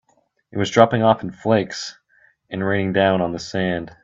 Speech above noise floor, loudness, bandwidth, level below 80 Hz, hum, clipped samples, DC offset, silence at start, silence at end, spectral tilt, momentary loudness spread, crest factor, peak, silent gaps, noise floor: 39 dB; -20 LUFS; 7.8 kHz; -56 dBFS; none; under 0.1%; under 0.1%; 0.55 s; 0.1 s; -6 dB/octave; 15 LU; 20 dB; 0 dBFS; none; -58 dBFS